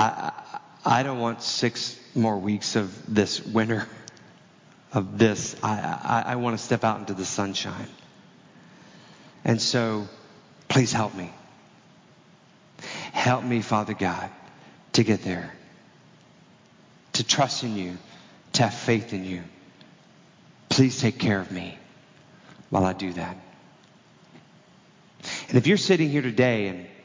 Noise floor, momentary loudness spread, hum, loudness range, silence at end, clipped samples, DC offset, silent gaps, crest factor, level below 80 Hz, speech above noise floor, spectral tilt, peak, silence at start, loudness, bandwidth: -55 dBFS; 16 LU; none; 4 LU; 0.1 s; under 0.1%; under 0.1%; none; 22 dB; -58 dBFS; 30 dB; -4.5 dB/octave; -6 dBFS; 0 s; -25 LUFS; 7.8 kHz